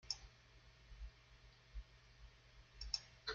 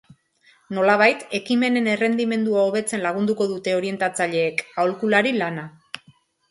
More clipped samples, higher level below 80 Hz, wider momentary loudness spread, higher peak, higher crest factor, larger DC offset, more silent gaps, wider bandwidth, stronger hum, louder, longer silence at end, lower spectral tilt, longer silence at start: neither; first, -60 dBFS vs -70 dBFS; first, 20 LU vs 12 LU; second, -24 dBFS vs -2 dBFS; first, 30 dB vs 20 dB; neither; neither; second, 7.6 kHz vs 11.5 kHz; neither; second, -50 LUFS vs -21 LUFS; second, 0 s vs 0.55 s; second, -0.5 dB/octave vs -4.5 dB/octave; second, 0 s vs 0.7 s